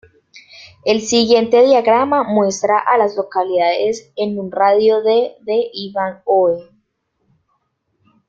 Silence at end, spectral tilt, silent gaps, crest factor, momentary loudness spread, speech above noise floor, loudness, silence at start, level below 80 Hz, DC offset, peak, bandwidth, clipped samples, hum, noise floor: 1.65 s; -4 dB/octave; none; 14 dB; 11 LU; 52 dB; -15 LUFS; 0.35 s; -62 dBFS; under 0.1%; -2 dBFS; 7.6 kHz; under 0.1%; none; -67 dBFS